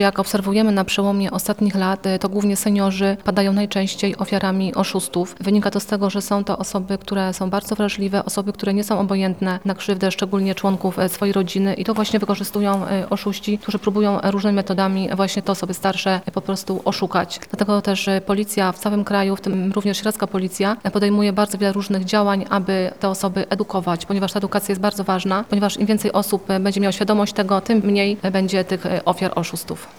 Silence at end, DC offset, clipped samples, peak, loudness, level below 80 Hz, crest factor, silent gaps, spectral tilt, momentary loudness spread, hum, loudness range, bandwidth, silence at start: 0.05 s; 0.3%; under 0.1%; -2 dBFS; -20 LUFS; -54 dBFS; 18 dB; none; -5.5 dB/octave; 4 LU; none; 2 LU; 18 kHz; 0 s